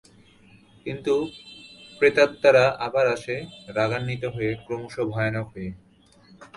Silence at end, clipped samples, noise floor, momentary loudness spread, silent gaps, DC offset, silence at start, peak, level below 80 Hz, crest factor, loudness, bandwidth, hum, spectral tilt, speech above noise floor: 0.1 s; under 0.1%; -55 dBFS; 19 LU; none; under 0.1%; 0.85 s; -4 dBFS; -56 dBFS; 20 dB; -24 LUFS; 11.5 kHz; none; -6 dB/octave; 32 dB